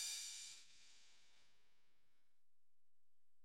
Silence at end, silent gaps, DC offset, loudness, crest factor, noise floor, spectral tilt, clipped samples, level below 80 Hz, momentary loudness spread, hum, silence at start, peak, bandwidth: 0 s; none; under 0.1%; -50 LUFS; 22 dB; under -90 dBFS; 3.5 dB/octave; under 0.1%; under -90 dBFS; 21 LU; none; 0 s; -34 dBFS; 16 kHz